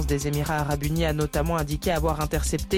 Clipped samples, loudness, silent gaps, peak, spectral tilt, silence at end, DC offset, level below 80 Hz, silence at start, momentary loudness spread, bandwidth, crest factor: under 0.1%; -26 LUFS; none; -12 dBFS; -5.5 dB/octave; 0 s; under 0.1%; -32 dBFS; 0 s; 1 LU; 17 kHz; 12 dB